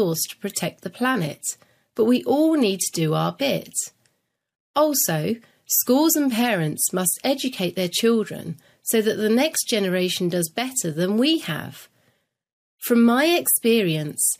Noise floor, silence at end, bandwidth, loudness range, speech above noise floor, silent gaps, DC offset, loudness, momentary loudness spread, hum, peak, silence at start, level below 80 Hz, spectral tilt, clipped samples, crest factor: -72 dBFS; 0.05 s; 15.5 kHz; 2 LU; 51 dB; 4.60-4.74 s, 12.53-12.78 s; under 0.1%; -21 LUFS; 12 LU; none; -6 dBFS; 0 s; -70 dBFS; -3.5 dB/octave; under 0.1%; 16 dB